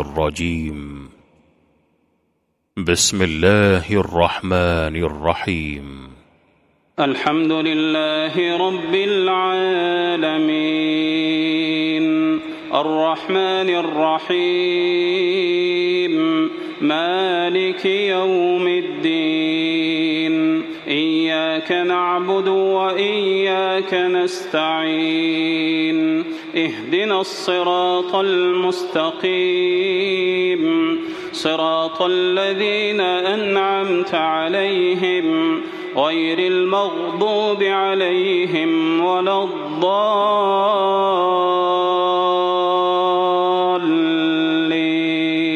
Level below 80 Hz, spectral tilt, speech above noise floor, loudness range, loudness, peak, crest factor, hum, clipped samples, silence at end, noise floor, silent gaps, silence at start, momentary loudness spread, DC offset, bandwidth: -44 dBFS; -4.5 dB/octave; 50 dB; 2 LU; -18 LUFS; 0 dBFS; 18 dB; none; under 0.1%; 0 s; -68 dBFS; none; 0 s; 4 LU; under 0.1%; 14 kHz